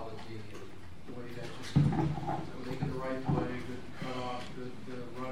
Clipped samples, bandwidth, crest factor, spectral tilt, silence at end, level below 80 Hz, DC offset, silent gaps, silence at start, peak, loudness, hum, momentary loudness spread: under 0.1%; 12.5 kHz; 22 dB; -7.5 dB/octave; 0 s; -54 dBFS; 0.9%; none; 0 s; -14 dBFS; -36 LUFS; none; 16 LU